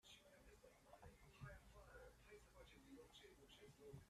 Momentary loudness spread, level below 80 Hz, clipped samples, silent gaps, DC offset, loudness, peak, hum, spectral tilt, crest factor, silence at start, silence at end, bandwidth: 6 LU; -72 dBFS; under 0.1%; none; under 0.1%; -66 LUFS; -46 dBFS; none; -4.5 dB/octave; 18 dB; 0.05 s; 0 s; 14 kHz